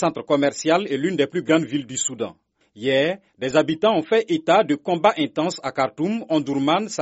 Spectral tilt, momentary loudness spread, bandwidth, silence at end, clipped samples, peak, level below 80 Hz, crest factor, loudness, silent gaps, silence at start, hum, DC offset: -4 dB/octave; 7 LU; 8 kHz; 0 s; under 0.1%; -2 dBFS; -64 dBFS; 18 dB; -21 LUFS; none; 0 s; none; under 0.1%